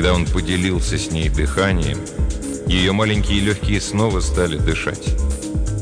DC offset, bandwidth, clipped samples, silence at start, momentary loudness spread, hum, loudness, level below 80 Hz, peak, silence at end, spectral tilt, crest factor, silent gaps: under 0.1%; 10 kHz; under 0.1%; 0 s; 6 LU; none; -19 LUFS; -24 dBFS; -4 dBFS; 0 s; -5 dB/octave; 14 dB; none